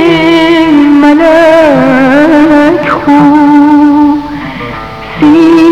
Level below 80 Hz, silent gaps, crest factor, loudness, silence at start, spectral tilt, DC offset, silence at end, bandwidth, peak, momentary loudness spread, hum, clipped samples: -34 dBFS; none; 4 dB; -4 LUFS; 0 s; -6.5 dB/octave; under 0.1%; 0 s; 9 kHz; 0 dBFS; 14 LU; none; 4%